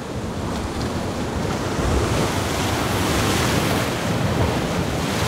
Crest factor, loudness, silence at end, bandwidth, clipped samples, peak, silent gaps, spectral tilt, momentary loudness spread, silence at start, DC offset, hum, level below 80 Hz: 14 dB; -22 LUFS; 0 s; 16 kHz; under 0.1%; -6 dBFS; none; -5 dB/octave; 6 LU; 0 s; under 0.1%; none; -34 dBFS